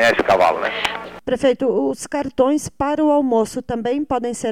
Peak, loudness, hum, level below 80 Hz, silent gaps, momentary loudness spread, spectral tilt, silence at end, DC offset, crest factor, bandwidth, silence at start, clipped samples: -4 dBFS; -19 LUFS; none; -48 dBFS; none; 8 LU; -4 dB/octave; 0 s; 0.3%; 14 dB; 17 kHz; 0 s; under 0.1%